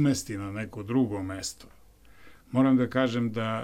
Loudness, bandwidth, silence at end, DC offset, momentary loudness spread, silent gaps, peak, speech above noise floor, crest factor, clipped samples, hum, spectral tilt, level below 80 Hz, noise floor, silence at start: -28 LUFS; 14.5 kHz; 0 s; under 0.1%; 13 LU; none; -12 dBFS; 28 dB; 16 dB; under 0.1%; none; -6 dB/octave; -58 dBFS; -55 dBFS; 0 s